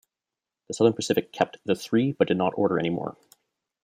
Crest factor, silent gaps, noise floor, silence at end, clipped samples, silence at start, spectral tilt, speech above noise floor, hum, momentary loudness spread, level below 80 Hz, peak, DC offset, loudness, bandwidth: 22 dB; none; -89 dBFS; 0.7 s; under 0.1%; 0.7 s; -5.5 dB/octave; 64 dB; none; 7 LU; -68 dBFS; -6 dBFS; under 0.1%; -25 LUFS; 15.5 kHz